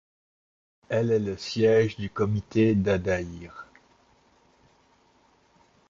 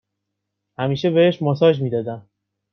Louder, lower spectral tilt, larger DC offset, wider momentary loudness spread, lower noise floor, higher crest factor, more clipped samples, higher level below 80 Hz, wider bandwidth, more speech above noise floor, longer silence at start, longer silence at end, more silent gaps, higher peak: second, -25 LUFS vs -19 LUFS; about the same, -7 dB/octave vs -8 dB/octave; neither; first, 17 LU vs 12 LU; second, -63 dBFS vs -79 dBFS; about the same, 18 dB vs 18 dB; neither; first, -52 dBFS vs -62 dBFS; first, 7.6 kHz vs 6.4 kHz; second, 38 dB vs 61 dB; about the same, 0.9 s vs 0.8 s; first, 2.25 s vs 0.55 s; neither; second, -10 dBFS vs -2 dBFS